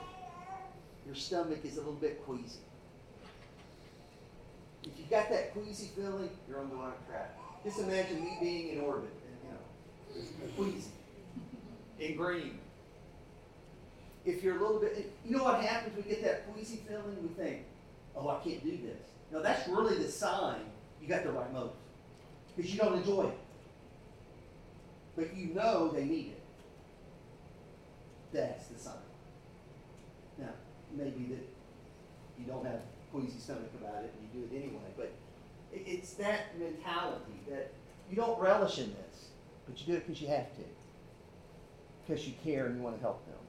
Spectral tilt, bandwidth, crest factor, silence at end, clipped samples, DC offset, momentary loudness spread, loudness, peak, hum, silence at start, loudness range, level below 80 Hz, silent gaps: -5.5 dB/octave; 15.5 kHz; 24 dB; 0 s; under 0.1%; under 0.1%; 24 LU; -38 LUFS; -16 dBFS; none; 0 s; 10 LU; -62 dBFS; none